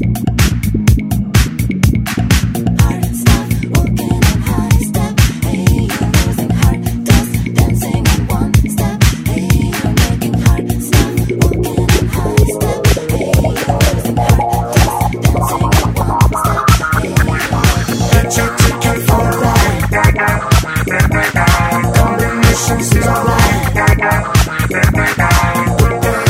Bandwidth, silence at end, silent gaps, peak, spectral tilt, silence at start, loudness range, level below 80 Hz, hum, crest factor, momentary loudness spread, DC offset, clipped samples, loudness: 16.5 kHz; 0 s; none; 0 dBFS; -5 dB/octave; 0 s; 2 LU; -18 dBFS; none; 12 dB; 3 LU; under 0.1%; under 0.1%; -13 LUFS